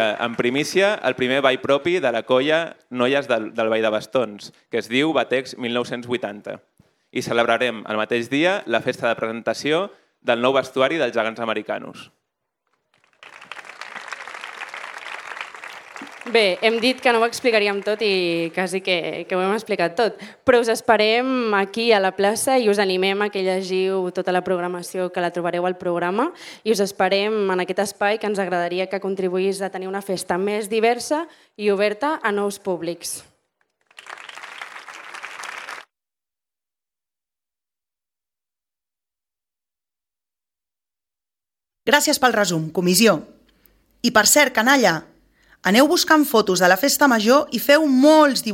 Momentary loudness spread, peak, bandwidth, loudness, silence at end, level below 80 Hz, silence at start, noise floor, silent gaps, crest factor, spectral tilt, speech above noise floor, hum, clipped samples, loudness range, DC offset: 17 LU; 0 dBFS; 17.5 kHz; -20 LUFS; 0 s; -66 dBFS; 0 s; under -90 dBFS; none; 20 dB; -3.5 dB/octave; over 70 dB; none; under 0.1%; 17 LU; under 0.1%